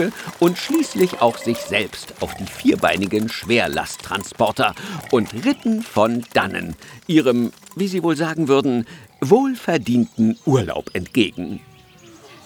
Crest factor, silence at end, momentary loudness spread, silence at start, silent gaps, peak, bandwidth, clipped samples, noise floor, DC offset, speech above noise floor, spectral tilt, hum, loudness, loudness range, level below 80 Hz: 18 dB; 0.1 s; 11 LU; 0 s; none; -2 dBFS; over 20 kHz; under 0.1%; -46 dBFS; under 0.1%; 26 dB; -5.5 dB/octave; none; -20 LUFS; 2 LU; -52 dBFS